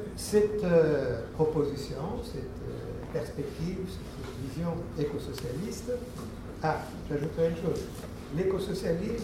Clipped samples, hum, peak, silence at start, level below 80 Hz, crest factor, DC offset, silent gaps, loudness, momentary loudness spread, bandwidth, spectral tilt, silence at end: under 0.1%; none; -12 dBFS; 0 s; -46 dBFS; 18 dB; under 0.1%; none; -32 LUFS; 13 LU; 16 kHz; -6.5 dB/octave; 0 s